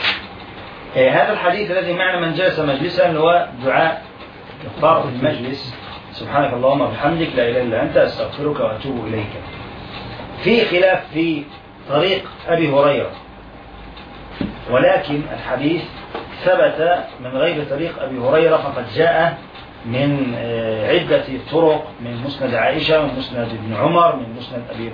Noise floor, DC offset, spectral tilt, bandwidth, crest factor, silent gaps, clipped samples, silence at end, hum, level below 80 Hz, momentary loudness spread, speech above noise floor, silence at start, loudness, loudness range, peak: -38 dBFS; under 0.1%; -8 dB/octave; 5.2 kHz; 16 dB; none; under 0.1%; 0 s; none; -46 dBFS; 18 LU; 20 dB; 0 s; -18 LUFS; 3 LU; -2 dBFS